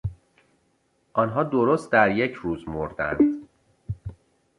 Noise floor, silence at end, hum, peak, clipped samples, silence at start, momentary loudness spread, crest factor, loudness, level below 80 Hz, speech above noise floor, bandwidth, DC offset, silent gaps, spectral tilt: -68 dBFS; 0.45 s; none; -4 dBFS; under 0.1%; 0.05 s; 17 LU; 22 dB; -23 LUFS; -48 dBFS; 45 dB; 11 kHz; under 0.1%; none; -7.5 dB/octave